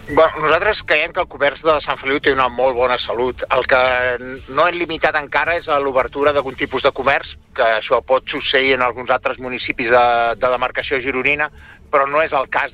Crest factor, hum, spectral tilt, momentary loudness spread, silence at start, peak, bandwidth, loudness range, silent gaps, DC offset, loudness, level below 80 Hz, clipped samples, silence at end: 14 dB; none; -6 dB/octave; 6 LU; 0 s; -2 dBFS; 7.2 kHz; 1 LU; none; under 0.1%; -17 LUFS; -42 dBFS; under 0.1%; 0.05 s